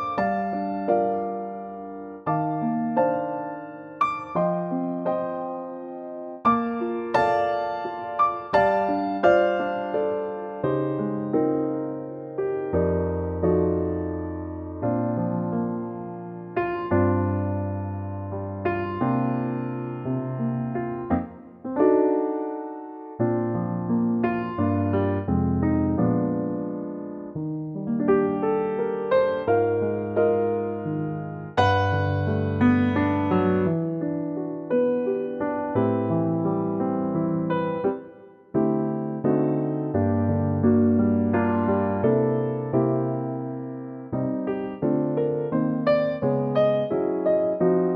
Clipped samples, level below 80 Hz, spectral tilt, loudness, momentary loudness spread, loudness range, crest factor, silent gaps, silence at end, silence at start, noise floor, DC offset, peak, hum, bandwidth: under 0.1%; -52 dBFS; -9.5 dB/octave; -25 LUFS; 10 LU; 4 LU; 18 dB; none; 0 s; 0 s; -46 dBFS; under 0.1%; -6 dBFS; none; 6.8 kHz